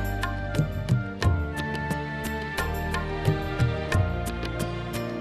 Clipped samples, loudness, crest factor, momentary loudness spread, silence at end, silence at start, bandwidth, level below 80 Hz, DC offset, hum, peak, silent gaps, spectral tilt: under 0.1%; -28 LUFS; 18 dB; 5 LU; 0 s; 0 s; 14 kHz; -36 dBFS; under 0.1%; none; -8 dBFS; none; -6 dB/octave